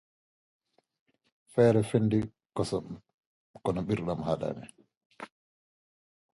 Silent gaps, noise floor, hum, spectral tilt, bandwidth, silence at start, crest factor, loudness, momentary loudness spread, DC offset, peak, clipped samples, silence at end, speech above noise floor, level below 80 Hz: 3.14-3.54 s, 4.97-5.10 s; under -90 dBFS; none; -7.5 dB/octave; 11.5 kHz; 1.55 s; 22 dB; -30 LUFS; 24 LU; under 0.1%; -10 dBFS; under 0.1%; 1.15 s; over 62 dB; -58 dBFS